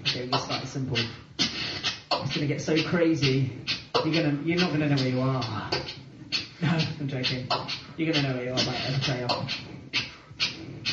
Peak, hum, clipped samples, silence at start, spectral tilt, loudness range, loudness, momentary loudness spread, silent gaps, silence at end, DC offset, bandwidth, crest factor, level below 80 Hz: -10 dBFS; none; under 0.1%; 0 s; -5 dB/octave; 3 LU; -27 LUFS; 6 LU; none; 0 s; under 0.1%; 7.8 kHz; 18 dB; -56 dBFS